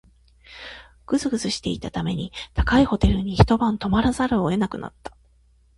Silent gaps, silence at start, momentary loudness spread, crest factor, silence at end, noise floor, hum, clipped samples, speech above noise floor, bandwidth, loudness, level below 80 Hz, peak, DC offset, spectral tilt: none; 0.5 s; 20 LU; 22 dB; 0.7 s; -58 dBFS; none; under 0.1%; 36 dB; 11.5 kHz; -22 LUFS; -32 dBFS; 0 dBFS; under 0.1%; -6 dB/octave